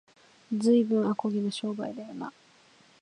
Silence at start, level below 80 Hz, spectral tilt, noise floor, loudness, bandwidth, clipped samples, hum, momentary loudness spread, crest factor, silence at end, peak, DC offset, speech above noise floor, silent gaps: 0.5 s; -78 dBFS; -6.5 dB/octave; -60 dBFS; -28 LUFS; 10.5 kHz; under 0.1%; none; 16 LU; 16 dB; 0.7 s; -12 dBFS; under 0.1%; 32 dB; none